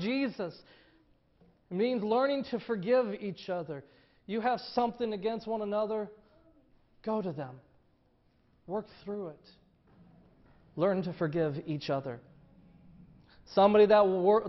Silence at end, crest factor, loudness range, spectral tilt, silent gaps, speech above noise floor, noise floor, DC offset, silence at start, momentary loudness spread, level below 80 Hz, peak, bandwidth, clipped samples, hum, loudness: 0 s; 20 dB; 10 LU; -5 dB/octave; none; 39 dB; -69 dBFS; under 0.1%; 0 s; 18 LU; -68 dBFS; -12 dBFS; 6 kHz; under 0.1%; none; -31 LUFS